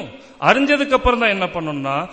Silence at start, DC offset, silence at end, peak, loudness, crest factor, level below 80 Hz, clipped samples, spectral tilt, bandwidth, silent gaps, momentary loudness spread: 0 s; 0.1%; 0 s; 0 dBFS; -17 LUFS; 18 dB; -36 dBFS; under 0.1%; -5 dB/octave; 8.8 kHz; none; 8 LU